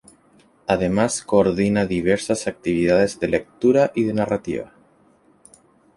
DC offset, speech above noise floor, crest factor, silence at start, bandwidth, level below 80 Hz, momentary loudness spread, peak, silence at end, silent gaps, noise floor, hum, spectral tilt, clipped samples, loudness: under 0.1%; 37 dB; 18 dB; 0.7 s; 11.5 kHz; -48 dBFS; 7 LU; -2 dBFS; 1.3 s; none; -56 dBFS; none; -5.5 dB/octave; under 0.1%; -20 LUFS